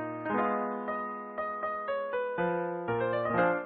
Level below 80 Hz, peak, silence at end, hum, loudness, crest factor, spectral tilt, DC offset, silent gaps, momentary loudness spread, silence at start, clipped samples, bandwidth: -66 dBFS; -14 dBFS; 0 s; none; -32 LUFS; 16 dB; -10 dB/octave; under 0.1%; none; 7 LU; 0 s; under 0.1%; 4.5 kHz